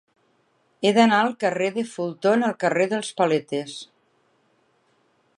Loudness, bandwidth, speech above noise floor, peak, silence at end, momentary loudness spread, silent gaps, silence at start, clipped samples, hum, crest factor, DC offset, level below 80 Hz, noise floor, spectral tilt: -22 LUFS; 11.5 kHz; 44 dB; -4 dBFS; 1.55 s; 12 LU; none; 0.8 s; under 0.1%; none; 20 dB; under 0.1%; -76 dBFS; -66 dBFS; -5 dB/octave